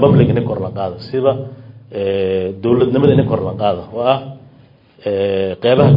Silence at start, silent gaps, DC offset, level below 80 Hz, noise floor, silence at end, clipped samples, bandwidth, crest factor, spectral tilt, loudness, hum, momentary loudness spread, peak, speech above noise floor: 0 s; none; under 0.1%; -48 dBFS; -46 dBFS; 0 s; under 0.1%; 5.4 kHz; 16 dB; -11 dB/octave; -16 LUFS; none; 12 LU; 0 dBFS; 32 dB